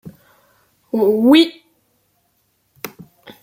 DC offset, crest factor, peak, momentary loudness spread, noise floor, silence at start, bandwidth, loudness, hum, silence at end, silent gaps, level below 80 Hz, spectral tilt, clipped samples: under 0.1%; 18 dB; -2 dBFS; 22 LU; -64 dBFS; 0.05 s; 16 kHz; -14 LUFS; none; 0.1 s; none; -64 dBFS; -5 dB/octave; under 0.1%